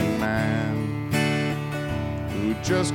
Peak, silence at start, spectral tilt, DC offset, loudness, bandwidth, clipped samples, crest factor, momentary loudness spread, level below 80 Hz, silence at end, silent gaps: -10 dBFS; 0 s; -6 dB/octave; under 0.1%; -25 LUFS; 17 kHz; under 0.1%; 16 dB; 5 LU; -44 dBFS; 0 s; none